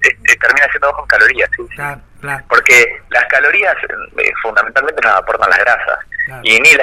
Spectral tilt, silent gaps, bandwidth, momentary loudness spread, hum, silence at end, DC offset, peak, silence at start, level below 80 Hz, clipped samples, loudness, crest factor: -1.5 dB/octave; none; 17 kHz; 14 LU; none; 0 s; under 0.1%; 0 dBFS; 0 s; -42 dBFS; 0.1%; -10 LUFS; 12 dB